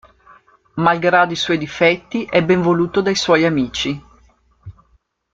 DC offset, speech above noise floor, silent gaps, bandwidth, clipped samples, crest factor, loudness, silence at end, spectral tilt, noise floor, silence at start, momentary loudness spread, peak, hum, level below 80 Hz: under 0.1%; 43 dB; none; 7.8 kHz; under 0.1%; 16 dB; -16 LUFS; 0.65 s; -5 dB/octave; -60 dBFS; 0.75 s; 8 LU; -2 dBFS; none; -50 dBFS